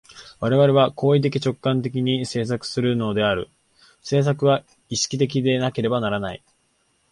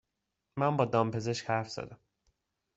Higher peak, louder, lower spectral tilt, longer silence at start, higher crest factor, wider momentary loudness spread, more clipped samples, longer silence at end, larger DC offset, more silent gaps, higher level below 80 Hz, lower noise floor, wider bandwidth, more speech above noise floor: first, -4 dBFS vs -12 dBFS; first, -21 LUFS vs -31 LUFS; about the same, -5.5 dB/octave vs -6 dB/octave; second, 0.1 s vs 0.55 s; about the same, 18 dB vs 22 dB; second, 9 LU vs 15 LU; neither; about the same, 0.75 s vs 0.8 s; neither; neither; first, -54 dBFS vs -68 dBFS; second, -66 dBFS vs -85 dBFS; first, 11.5 kHz vs 8.2 kHz; second, 45 dB vs 54 dB